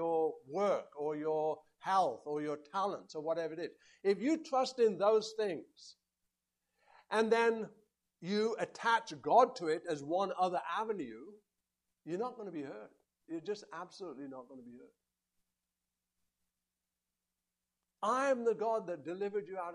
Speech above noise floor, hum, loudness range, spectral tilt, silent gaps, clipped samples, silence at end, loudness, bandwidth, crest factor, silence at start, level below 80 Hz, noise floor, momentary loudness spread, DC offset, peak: over 55 dB; none; 15 LU; -5 dB/octave; none; under 0.1%; 0 s; -35 LUFS; 11 kHz; 22 dB; 0 s; -86 dBFS; under -90 dBFS; 16 LU; under 0.1%; -14 dBFS